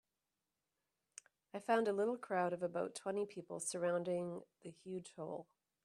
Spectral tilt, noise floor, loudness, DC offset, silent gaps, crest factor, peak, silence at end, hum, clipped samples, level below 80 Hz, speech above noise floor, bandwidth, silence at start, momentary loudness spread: -4.5 dB/octave; under -90 dBFS; -41 LUFS; under 0.1%; none; 22 dB; -22 dBFS; 0.4 s; none; under 0.1%; -88 dBFS; over 50 dB; 13 kHz; 1.55 s; 19 LU